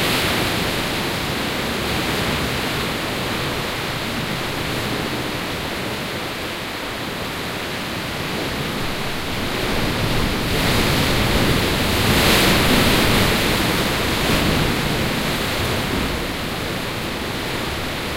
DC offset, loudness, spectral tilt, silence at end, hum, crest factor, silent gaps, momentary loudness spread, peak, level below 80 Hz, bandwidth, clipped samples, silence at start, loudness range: under 0.1%; -20 LUFS; -4 dB/octave; 0 s; none; 18 dB; none; 9 LU; -2 dBFS; -32 dBFS; 16 kHz; under 0.1%; 0 s; 8 LU